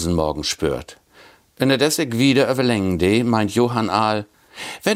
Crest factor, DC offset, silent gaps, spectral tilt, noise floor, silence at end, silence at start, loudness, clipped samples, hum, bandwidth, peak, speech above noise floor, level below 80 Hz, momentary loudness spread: 18 dB; under 0.1%; none; -5 dB/octave; -50 dBFS; 0 s; 0 s; -19 LUFS; under 0.1%; none; 16 kHz; -2 dBFS; 31 dB; -46 dBFS; 10 LU